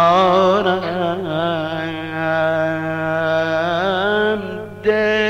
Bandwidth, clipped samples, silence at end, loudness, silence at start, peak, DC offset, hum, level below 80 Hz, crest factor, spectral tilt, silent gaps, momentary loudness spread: 11 kHz; under 0.1%; 0 s; -18 LUFS; 0 s; -2 dBFS; 0.4%; 50 Hz at -40 dBFS; -56 dBFS; 14 dB; -6 dB/octave; none; 9 LU